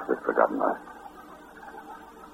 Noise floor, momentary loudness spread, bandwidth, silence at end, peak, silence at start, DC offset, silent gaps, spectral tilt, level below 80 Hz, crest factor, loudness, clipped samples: -47 dBFS; 22 LU; 16 kHz; 0 s; -6 dBFS; 0 s; under 0.1%; none; -6.5 dB/octave; -64 dBFS; 24 dB; -26 LUFS; under 0.1%